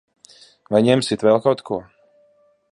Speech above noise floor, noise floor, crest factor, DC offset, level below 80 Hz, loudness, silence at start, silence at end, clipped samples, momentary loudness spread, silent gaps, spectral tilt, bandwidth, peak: 41 dB; -59 dBFS; 18 dB; under 0.1%; -60 dBFS; -19 LUFS; 0.7 s; 0.9 s; under 0.1%; 11 LU; none; -6 dB/octave; 11.5 kHz; -2 dBFS